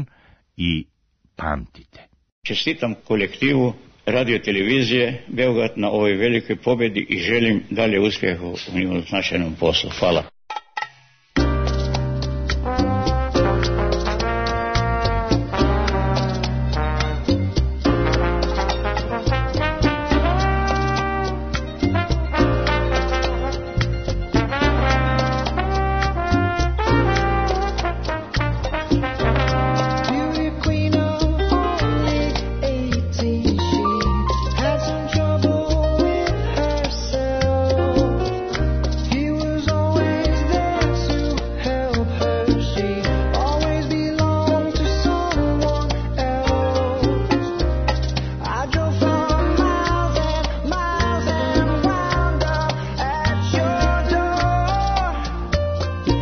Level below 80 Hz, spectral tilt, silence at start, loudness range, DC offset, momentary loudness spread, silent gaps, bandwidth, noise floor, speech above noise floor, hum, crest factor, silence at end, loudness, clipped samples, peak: -26 dBFS; -6 dB/octave; 0 s; 2 LU; under 0.1%; 5 LU; 2.32-2.42 s; 6.6 kHz; -54 dBFS; 34 dB; none; 14 dB; 0 s; -21 LUFS; under 0.1%; -6 dBFS